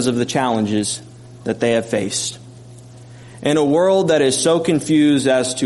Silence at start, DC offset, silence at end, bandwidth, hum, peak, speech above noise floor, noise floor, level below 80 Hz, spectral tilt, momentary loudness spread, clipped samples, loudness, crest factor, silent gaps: 0 s; under 0.1%; 0 s; 11.5 kHz; none; -4 dBFS; 23 dB; -39 dBFS; -56 dBFS; -4.5 dB/octave; 11 LU; under 0.1%; -17 LUFS; 14 dB; none